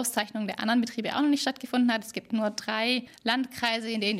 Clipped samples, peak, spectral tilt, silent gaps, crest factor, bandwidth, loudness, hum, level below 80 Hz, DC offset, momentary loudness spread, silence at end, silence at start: under 0.1%; -10 dBFS; -3 dB/octave; none; 18 dB; 16 kHz; -28 LUFS; none; -72 dBFS; under 0.1%; 4 LU; 0 s; 0 s